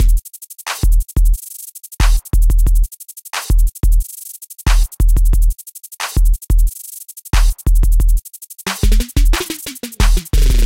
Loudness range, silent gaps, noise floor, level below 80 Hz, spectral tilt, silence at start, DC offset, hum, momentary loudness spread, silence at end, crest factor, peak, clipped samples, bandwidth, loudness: 1 LU; none; -33 dBFS; -14 dBFS; -4 dB/octave; 0 s; under 0.1%; none; 14 LU; 0 s; 12 dB; 0 dBFS; under 0.1%; 17 kHz; -18 LUFS